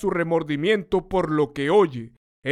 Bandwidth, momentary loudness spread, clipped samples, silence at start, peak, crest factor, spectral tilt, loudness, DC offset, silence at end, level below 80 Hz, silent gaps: 11 kHz; 5 LU; under 0.1%; 0 s; -6 dBFS; 16 dB; -7 dB/octave; -22 LUFS; under 0.1%; 0 s; -48 dBFS; 2.17-2.42 s